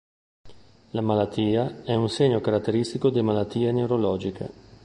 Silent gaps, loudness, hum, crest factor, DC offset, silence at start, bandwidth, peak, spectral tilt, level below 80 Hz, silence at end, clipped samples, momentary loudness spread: none; -24 LUFS; none; 16 dB; under 0.1%; 0.45 s; 11 kHz; -8 dBFS; -7.5 dB/octave; -54 dBFS; 0.35 s; under 0.1%; 8 LU